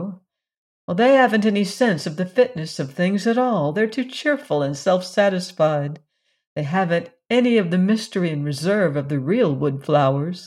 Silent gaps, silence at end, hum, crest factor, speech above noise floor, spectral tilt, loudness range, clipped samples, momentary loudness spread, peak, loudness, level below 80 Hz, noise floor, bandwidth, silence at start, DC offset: 0.57-0.88 s, 6.47-6.56 s; 0 s; none; 16 dB; 21 dB; -6.5 dB/octave; 2 LU; under 0.1%; 8 LU; -4 dBFS; -20 LUFS; -68 dBFS; -41 dBFS; 13 kHz; 0 s; under 0.1%